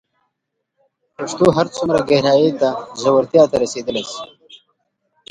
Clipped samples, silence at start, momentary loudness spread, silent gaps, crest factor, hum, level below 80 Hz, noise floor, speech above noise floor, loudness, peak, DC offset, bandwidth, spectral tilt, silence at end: under 0.1%; 1.2 s; 15 LU; none; 18 dB; none; -52 dBFS; -76 dBFS; 60 dB; -16 LUFS; 0 dBFS; under 0.1%; 11 kHz; -5.5 dB/octave; 1.05 s